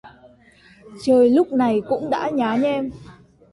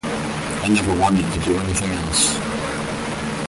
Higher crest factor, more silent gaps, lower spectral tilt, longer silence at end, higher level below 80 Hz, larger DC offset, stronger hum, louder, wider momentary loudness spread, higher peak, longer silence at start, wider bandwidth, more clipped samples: about the same, 14 dB vs 16 dB; neither; first, -6.5 dB/octave vs -4 dB/octave; first, 0.4 s vs 0 s; second, -56 dBFS vs -36 dBFS; neither; neither; about the same, -19 LUFS vs -20 LUFS; first, 11 LU vs 8 LU; about the same, -6 dBFS vs -6 dBFS; about the same, 0.05 s vs 0.05 s; about the same, 11.5 kHz vs 11.5 kHz; neither